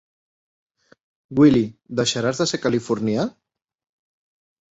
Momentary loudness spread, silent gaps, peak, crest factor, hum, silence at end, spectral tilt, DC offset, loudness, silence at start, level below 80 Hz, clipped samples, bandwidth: 10 LU; none; -4 dBFS; 20 dB; none; 1.4 s; -5 dB/octave; under 0.1%; -20 LUFS; 1.3 s; -56 dBFS; under 0.1%; 8.2 kHz